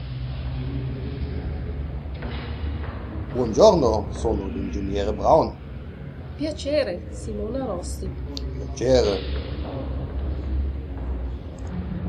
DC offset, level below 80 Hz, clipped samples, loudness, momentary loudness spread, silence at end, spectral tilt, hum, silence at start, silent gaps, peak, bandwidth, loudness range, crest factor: under 0.1%; -32 dBFS; under 0.1%; -25 LUFS; 14 LU; 0 s; -6.5 dB/octave; none; 0 s; none; -2 dBFS; 10.5 kHz; 8 LU; 22 dB